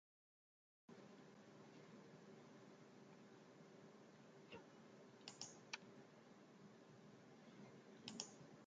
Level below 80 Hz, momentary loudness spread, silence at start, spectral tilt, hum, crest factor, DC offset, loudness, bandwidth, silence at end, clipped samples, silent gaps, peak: under -90 dBFS; 10 LU; 0.9 s; -3 dB/octave; none; 32 dB; under 0.1%; -61 LUFS; 9 kHz; 0 s; under 0.1%; none; -30 dBFS